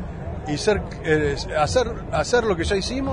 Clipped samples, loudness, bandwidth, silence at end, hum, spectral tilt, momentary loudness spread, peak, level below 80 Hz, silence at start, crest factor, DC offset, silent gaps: under 0.1%; -23 LUFS; 10.5 kHz; 0 s; none; -5 dB/octave; 6 LU; -6 dBFS; -34 dBFS; 0 s; 16 dB; under 0.1%; none